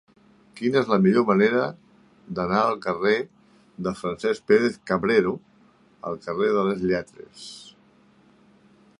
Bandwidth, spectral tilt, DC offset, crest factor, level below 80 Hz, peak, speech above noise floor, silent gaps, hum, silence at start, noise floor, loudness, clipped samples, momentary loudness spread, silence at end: 11 kHz; -6.5 dB/octave; under 0.1%; 20 dB; -60 dBFS; -4 dBFS; 35 dB; none; none; 0.55 s; -57 dBFS; -23 LUFS; under 0.1%; 19 LU; 1.3 s